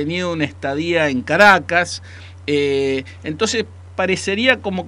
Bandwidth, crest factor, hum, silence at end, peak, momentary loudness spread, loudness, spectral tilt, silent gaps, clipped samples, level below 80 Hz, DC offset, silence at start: 15.5 kHz; 18 dB; none; 0 s; 0 dBFS; 16 LU; -17 LUFS; -4 dB/octave; none; under 0.1%; -52 dBFS; under 0.1%; 0 s